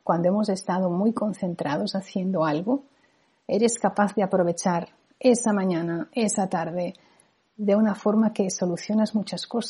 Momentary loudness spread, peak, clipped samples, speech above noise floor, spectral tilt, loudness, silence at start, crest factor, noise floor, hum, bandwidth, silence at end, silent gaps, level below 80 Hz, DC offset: 7 LU; -6 dBFS; under 0.1%; 40 dB; -5.5 dB/octave; -25 LUFS; 0.05 s; 18 dB; -64 dBFS; none; 11.5 kHz; 0 s; none; -72 dBFS; under 0.1%